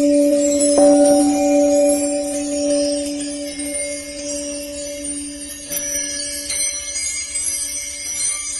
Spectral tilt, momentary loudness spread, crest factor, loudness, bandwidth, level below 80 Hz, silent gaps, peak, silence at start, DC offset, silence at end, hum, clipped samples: -2 dB/octave; 12 LU; 16 dB; -18 LUFS; 13 kHz; -48 dBFS; none; -2 dBFS; 0 s; under 0.1%; 0 s; none; under 0.1%